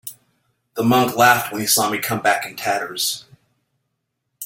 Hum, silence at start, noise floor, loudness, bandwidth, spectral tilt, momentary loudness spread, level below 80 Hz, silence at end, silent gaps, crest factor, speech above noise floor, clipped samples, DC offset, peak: none; 0.05 s; -75 dBFS; -18 LUFS; 17 kHz; -3 dB/octave; 10 LU; -60 dBFS; 0 s; none; 20 dB; 57 dB; under 0.1%; under 0.1%; -2 dBFS